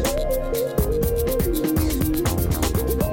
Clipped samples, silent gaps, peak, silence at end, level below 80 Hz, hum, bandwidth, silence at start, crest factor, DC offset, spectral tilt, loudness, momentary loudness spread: under 0.1%; none; -10 dBFS; 0 s; -28 dBFS; none; 18 kHz; 0 s; 12 dB; under 0.1%; -5.5 dB/octave; -22 LUFS; 2 LU